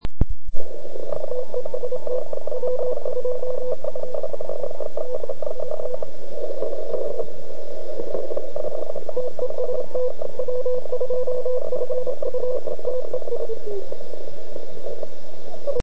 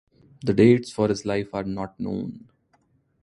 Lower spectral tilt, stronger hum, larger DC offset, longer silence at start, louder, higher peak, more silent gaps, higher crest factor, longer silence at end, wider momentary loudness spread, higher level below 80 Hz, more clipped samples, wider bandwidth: about the same, -7.5 dB/octave vs -7 dB/octave; neither; first, 20% vs under 0.1%; second, 0 s vs 0.45 s; second, -29 LUFS vs -23 LUFS; first, 0 dBFS vs -4 dBFS; neither; about the same, 22 dB vs 20 dB; second, 0 s vs 0.85 s; second, 10 LU vs 14 LU; first, -38 dBFS vs -54 dBFS; neither; second, 8.6 kHz vs 11.5 kHz